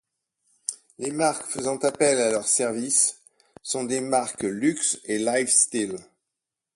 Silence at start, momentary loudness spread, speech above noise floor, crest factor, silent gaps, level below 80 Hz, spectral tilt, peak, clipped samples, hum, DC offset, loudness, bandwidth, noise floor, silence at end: 0.7 s; 14 LU; 62 dB; 22 dB; none; -68 dBFS; -2.5 dB/octave; -4 dBFS; under 0.1%; none; under 0.1%; -23 LUFS; 11.5 kHz; -86 dBFS; 0.75 s